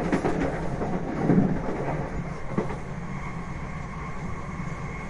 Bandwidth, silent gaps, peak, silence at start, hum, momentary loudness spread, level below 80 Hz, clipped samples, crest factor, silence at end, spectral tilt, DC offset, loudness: 11 kHz; none; -8 dBFS; 0 s; none; 12 LU; -40 dBFS; under 0.1%; 20 dB; 0 s; -8 dB/octave; under 0.1%; -29 LUFS